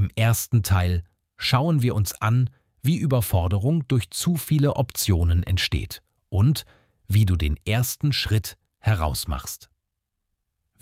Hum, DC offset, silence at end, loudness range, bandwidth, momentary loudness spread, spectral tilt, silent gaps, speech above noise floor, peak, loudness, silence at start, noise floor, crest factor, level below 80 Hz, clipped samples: none; under 0.1%; 1.25 s; 2 LU; 16.5 kHz; 8 LU; -5.5 dB/octave; none; 58 dB; -8 dBFS; -23 LUFS; 0 s; -80 dBFS; 14 dB; -36 dBFS; under 0.1%